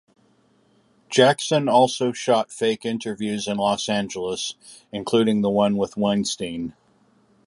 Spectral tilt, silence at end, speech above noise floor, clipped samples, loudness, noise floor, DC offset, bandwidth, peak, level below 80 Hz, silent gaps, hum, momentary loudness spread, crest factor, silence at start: -4.5 dB/octave; 0.75 s; 39 dB; under 0.1%; -22 LUFS; -61 dBFS; under 0.1%; 11.5 kHz; -2 dBFS; -60 dBFS; none; none; 12 LU; 20 dB; 1.1 s